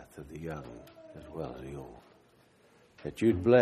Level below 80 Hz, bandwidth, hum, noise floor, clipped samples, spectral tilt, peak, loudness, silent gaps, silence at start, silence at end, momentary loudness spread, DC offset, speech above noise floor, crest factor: -58 dBFS; 13.5 kHz; none; -63 dBFS; under 0.1%; -7.5 dB/octave; -10 dBFS; -33 LUFS; none; 0 s; 0 s; 22 LU; under 0.1%; 33 dB; 22 dB